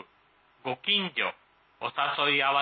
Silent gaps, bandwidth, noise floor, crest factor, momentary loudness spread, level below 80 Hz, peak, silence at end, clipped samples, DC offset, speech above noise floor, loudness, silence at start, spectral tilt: none; 4.8 kHz; -64 dBFS; 18 dB; 13 LU; -80 dBFS; -12 dBFS; 0 s; under 0.1%; under 0.1%; 36 dB; -27 LUFS; 0.65 s; -7 dB/octave